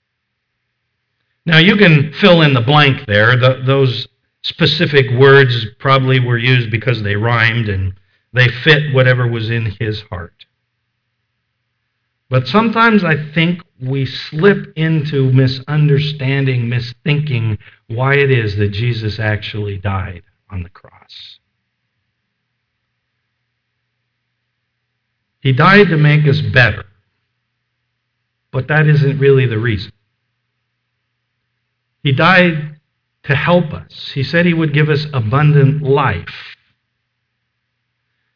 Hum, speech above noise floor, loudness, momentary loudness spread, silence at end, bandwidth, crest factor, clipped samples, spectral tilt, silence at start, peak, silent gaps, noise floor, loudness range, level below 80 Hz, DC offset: none; 59 dB; -13 LUFS; 16 LU; 1.8 s; 5.4 kHz; 14 dB; under 0.1%; -8 dB/octave; 1.45 s; 0 dBFS; none; -72 dBFS; 7 LU; -48 dBFS; under 0.1%